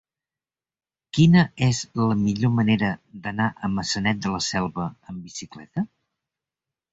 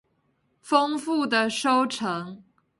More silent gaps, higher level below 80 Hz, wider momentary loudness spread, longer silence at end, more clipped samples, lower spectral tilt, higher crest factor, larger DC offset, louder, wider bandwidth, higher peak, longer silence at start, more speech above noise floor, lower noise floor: neither; first, -52 dBFS vs -72 dBFS; first, 16 LU vs 8 LU; first, 1.05 s vs 0.4 s; neither; first, -5.5 dB/octave vs -3.5 dB/octave; about the same, 18 dB vs 20 dB; neither; about the same, -23 LUFS vs -24 LUFS; second, 8 kHz vs 11.5 kHz; about the same, -6 dBFS vs -6 dBFS; first, 1.15 s vs 0.65 s; first, over 68 dB vs 46 dB; first, under -90 dBFS vs -70 dBFS